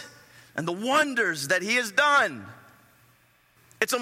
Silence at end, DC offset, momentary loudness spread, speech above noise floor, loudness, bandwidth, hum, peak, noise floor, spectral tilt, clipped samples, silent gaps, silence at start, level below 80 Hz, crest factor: 0 s; under 0.1%; 15 LU; 37 dB; -24 LUFS; 16.5 kHz; none; -6 dBFS; -62 dBFS; -2.5 dB/octave; under 0.1%; none; 0 s; -76 dBFS; 20 dB